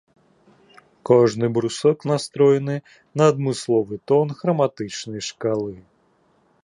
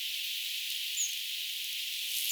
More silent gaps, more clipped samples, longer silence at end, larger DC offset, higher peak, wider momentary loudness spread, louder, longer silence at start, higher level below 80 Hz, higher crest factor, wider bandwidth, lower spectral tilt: neither; neither; first, 0.85 s vs 0 s; neither; first, -2 dBFS vs -18 dBFS; first, 13 LU vs 3 LU; first, -21 LUFS vs -33 LUFS; first, 1.05 s vs 0 s; first, -62 dBFS vs under -90 dBFS; about the same, 18 dB vs 18 dB; second, 11 kHz vs over 20 kHz; first, -6 dB/octave vs 12.5 dB/octave